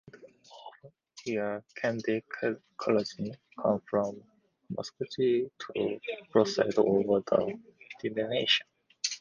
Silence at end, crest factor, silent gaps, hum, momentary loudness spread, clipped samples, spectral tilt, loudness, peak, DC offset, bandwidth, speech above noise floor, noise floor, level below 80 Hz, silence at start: 0 s; 22 dB; none; none; 15 LU; under 0.1%; -4.5 dB/octave; -30 LUFS; -10 dBFS; under 0.1%; 10 kHz; 25 dB; -55 dBFS; -70 dBFS; 0.15 s